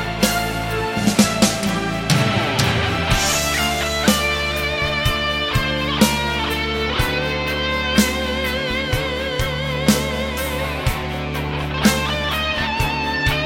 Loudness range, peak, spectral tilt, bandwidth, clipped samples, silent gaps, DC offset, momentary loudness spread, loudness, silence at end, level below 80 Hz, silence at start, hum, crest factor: 3 LU; -2 dBFS; -4 dB/octave; 17 kHz; under 0.1%; none; under 0.1%; 6 LU; -19 LUFS; 0 s; -30 dBFS; 0 s; none; 18 dB